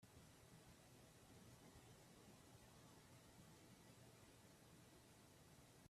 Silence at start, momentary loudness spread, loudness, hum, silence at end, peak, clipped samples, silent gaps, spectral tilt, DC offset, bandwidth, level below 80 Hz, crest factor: 0 s; 2 LU; -67 LUFS; none; 0 s; -54 dBFS; under 0.1%; none; -4 dB/octave; under 0.1%; 14.5 kHz; -82 dBFS; 14 dB